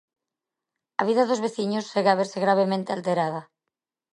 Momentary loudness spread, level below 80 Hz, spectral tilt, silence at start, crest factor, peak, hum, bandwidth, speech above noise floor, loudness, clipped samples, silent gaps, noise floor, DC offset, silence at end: 6 LU; -78 dBFS; -5.5 dB/octave; 1 s; 20 dB; -6 dBFS; none; 11 kHz; 64 dB; -24 LUFS; under 0.1%; none; -87 dBFS; under 0.1%; 0.7 s